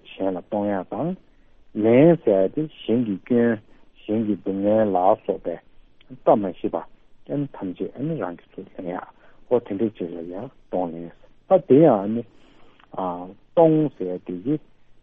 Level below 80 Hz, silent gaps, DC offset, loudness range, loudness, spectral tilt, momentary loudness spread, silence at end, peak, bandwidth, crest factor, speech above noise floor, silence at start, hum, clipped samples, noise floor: -56 dBFS; none; under 0.1%; 8 LU; -22 LUFS; -7.5 dB/octave; 18 LU; 0.45 s; -2 dBFS; 3.8 kHz; 20 dB; 28 dB; 0.1 s; none; under 0.1%; -49 dBFS